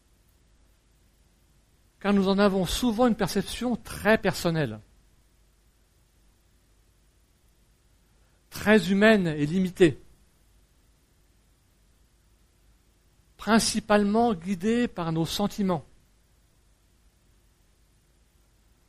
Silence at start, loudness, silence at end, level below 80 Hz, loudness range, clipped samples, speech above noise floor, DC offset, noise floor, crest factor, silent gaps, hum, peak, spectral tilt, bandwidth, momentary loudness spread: 2.05 s; -25 LUFS; 3.1 s; -50 dBFS; 8 LU; under 0.1%; 39 dB; under 0.1%; -63 dBFS; 22 dB; none; none; -6 dBFS; -5 dB/octave; 15 kHz; 10 LU